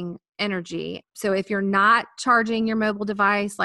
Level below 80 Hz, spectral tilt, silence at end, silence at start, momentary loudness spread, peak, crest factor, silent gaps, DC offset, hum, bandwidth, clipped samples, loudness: -62 dBFS; -5 dB/octave; 0 s; 0 s; 13 LU; -6 dBFS; 16 dB; 0.29-0.33 s; under 0.1%; none; 12.5 kHz; under 0.1%; -22 LUFS